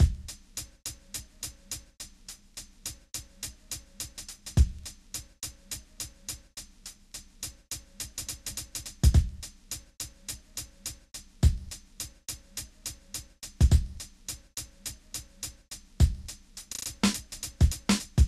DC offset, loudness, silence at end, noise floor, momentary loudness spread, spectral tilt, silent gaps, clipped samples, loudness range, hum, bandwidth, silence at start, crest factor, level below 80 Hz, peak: under 0.1%; -33 LUFS; 0 s; -50 dBFS; 17 LU; -4.5 dB/octave; none; under 0.1%; 9 LU; none; 14 kHz; 0 s; 20 dB; -34 dBFS; -10 dBFS